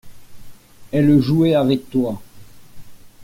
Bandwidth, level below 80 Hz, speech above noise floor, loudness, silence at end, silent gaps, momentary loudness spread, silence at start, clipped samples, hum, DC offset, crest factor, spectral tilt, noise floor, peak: 16 kHz; -50 dBFS; 22 dB; -17 LUFS; 0 s; none; 10 LU; 0.05 s; under 0.1%; none; under 0.1%; 16 dB; -8.5 dB/octave; -38 dBFS; -4 dBFS